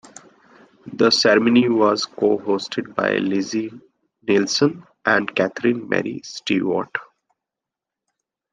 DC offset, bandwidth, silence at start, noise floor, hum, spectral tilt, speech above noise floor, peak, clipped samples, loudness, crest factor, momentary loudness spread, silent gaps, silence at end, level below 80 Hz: under 0.1%; 9.6 kHz; 0.85 s; -86 dBFS; none; -4.5 dB/octave; 67 dB; -2 dBFS; under 0.1%; -20 LUFS; 18 dB; 14 LU; none; 1.5 s; -68 dBFS